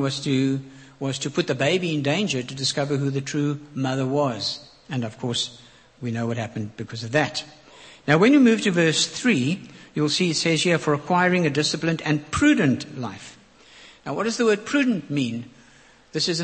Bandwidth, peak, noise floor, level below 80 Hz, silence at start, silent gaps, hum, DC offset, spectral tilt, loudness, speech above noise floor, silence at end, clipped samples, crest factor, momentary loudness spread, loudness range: 8.8 kHz; -2 dBFS; -53 dBFS; -58 dBFS; 0 s; none; none; under 0.1%; -4.5 dB/octave; -23 LUFS; 30 dB; 0 s; under 0.1%; 20 dB; 14 LU; 7 LU